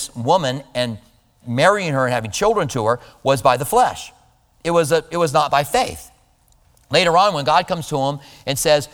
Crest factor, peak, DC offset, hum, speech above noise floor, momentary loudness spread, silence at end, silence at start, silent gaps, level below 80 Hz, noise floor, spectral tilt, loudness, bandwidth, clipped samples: 18 dB; 0 dBFS; under 0.1%; none; 38 dB; 10 LU; 0.05 s; 0 s; none; -48 dBFS; -56 dBFS; -4 dB/octave; -18 LUFS; over 20 kHz; under 0.1%